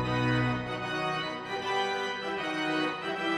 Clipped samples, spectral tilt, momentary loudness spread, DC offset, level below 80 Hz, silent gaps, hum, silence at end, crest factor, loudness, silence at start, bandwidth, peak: under 0.1%; -5.5 dB/octave; 5 LU; under 0.1%; -54 dBFS; none; none; 0 s; 14 dB; -31 LUFS; 0 s; 12.5 kHz; -16 dBFS